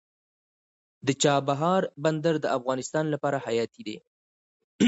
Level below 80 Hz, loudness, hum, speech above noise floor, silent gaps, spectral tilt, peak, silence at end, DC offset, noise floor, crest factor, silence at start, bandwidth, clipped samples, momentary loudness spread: -70 dBFS; -27 LUFS; none; over 64 dB; 4.07-4.79 s; -5 dB/octave; -10 dBFS; 0 s; under 0.1%; under -90 dBFS; 18 dB; 1.05 s; 8.4 kHz; under 0.1%; 10 LU